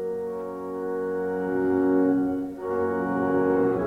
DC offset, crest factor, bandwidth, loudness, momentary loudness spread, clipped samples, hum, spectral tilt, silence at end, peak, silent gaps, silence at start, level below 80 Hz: under 0.1%; 12 dB; 3.9 kHz; -26 LUFS; 10 LU; under 0.1%; none; -9 dB/octave; 0 s; -12 dBFS; none; 0 s; -60 dBFS